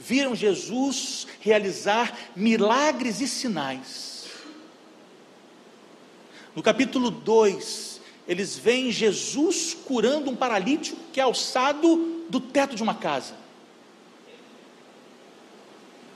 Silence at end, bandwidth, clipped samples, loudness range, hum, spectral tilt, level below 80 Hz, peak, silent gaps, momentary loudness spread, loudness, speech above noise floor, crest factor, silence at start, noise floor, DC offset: 0 s; 14 kHz; under 0.1%; 9 LU; none; -3.5 dB/octave; -74 dBFS; -6 dBFS; none; 13 LU; -24 LUFS; 27 dB; 20 dB; 0 s; -51 dBFS; under 0.1%